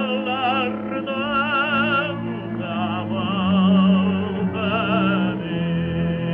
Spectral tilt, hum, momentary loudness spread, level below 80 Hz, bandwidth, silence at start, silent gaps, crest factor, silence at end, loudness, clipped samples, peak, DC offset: -9.5 dB/octave; none; 9 LU; -50 dBFS; 4.1 kHz; 0 s; none; 14 dB; 0 s; -21 LUFS; under 0.1%; -8 dBFS; under 0.1%